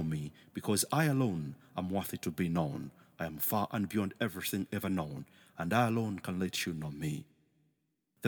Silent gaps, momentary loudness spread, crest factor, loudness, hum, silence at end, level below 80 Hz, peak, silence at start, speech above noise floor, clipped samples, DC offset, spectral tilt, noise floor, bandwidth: none; 12 LU; 20 dB; -35 LUFS; none; 0 s; -64 dBFS; -16 dBFS; 0 s; 45 dB; under 0.1%; under 0.1%; -5 dB/octave; -79 dBFS; over 20 kHz